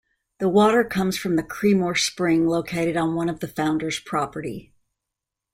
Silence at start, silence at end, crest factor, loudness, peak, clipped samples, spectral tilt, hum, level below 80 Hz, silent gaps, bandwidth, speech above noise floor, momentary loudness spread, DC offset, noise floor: 0.4 s; 0.9 s; 16 dB; -22 LUFS; -6 dBFS; under 0.1%; -5 dB/octave; none; -56 dBFS; none; 16 kHz; 63 dB; 9 LU; under 0.1%; -85 dBFS